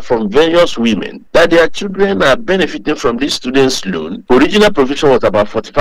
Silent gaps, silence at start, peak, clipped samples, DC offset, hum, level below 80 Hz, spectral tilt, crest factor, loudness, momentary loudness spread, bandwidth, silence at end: none; 0 s; 0 dBFS; under 0.1%; under 0.1%; none; -34 dBFS; -4.5 dB/octave; 12 dB; -12 LUFS; 6 LU; 15.5 kHz; 0 s